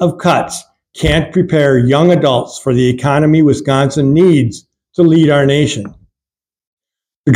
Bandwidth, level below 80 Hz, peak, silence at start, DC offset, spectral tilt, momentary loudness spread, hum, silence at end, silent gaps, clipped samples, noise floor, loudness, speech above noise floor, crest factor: 13 kHz; -36 dBFS; 0 dBFS; 0 s; under 0.1%; -6.5 dB/octave; 10 LU; none; 0 s; 6.67-6.77 s, 7.16-7.24 s; under 0.1%; -90 dBFS; -11 LUFS; 79 dB; 12 dB